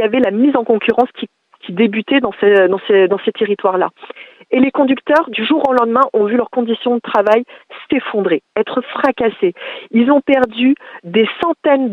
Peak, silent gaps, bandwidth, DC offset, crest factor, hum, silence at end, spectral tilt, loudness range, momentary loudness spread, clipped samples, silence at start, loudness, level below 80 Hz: 0 dBFS; none; 6.2 kHz; under 0.1%; 14 dB; none; 0 s; -7 dB/octave; 2 LU; 8 LU; under 0.1%; 0 s; -14 LUFS; -58 dBFS